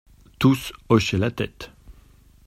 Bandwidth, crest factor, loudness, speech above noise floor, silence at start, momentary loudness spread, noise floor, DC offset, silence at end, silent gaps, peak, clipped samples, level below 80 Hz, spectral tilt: 16 kHz; 22 dB; -22 LUFS; 31 dB; 0.4 s; 16 LU; -52 dBFS; under 0.1%; 0.55 s; none; -2 dBFS; under 0.1%; -48 dBFS; -6 dB/octave